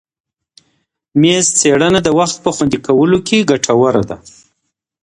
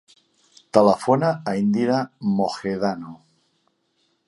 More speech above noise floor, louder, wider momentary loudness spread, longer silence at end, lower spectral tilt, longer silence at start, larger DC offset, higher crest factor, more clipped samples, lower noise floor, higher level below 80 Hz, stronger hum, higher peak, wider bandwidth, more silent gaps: first, 60 dB vs 48 dB; first, -12 LUFS vs -21 LUFS; about the same, 7 LU vs 8 LU; second, 0.75 s vs 1.1 s; second, -4 dB/octave vs -7 dB/octave; first, 1.15 s vs 0.75 s; neither; second, 14 dB vs 22 dB; neither; about the same, -72 dBFS vs -69 dBFS; first, -46 dBFS vs -62 dBFS; neither; about the same, 0 dBFS vs 0 dBFS; about the same, 11.5 kHz vs 11.5 kHz; neither